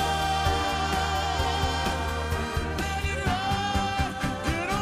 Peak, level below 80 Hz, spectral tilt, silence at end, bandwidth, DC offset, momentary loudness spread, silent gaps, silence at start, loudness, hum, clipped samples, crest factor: -12 dBFS; -34 dBFS; -4.5 dB/octave; 0 s; 15.5 kHz; under 0.1%; 4 LU; none; 0 s; -27 LUFS; none; under 0.1%; 16 dB